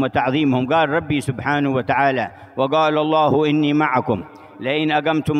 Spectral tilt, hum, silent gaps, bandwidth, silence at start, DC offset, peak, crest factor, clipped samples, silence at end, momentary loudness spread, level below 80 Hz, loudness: -7 dB/octave; none; none; 12 kHz; 0 s; under 0.1%; -2 dBFS; 16 dB; under 0.1%; 0 s; 8 LU; -52 dBFS; -19 LUFS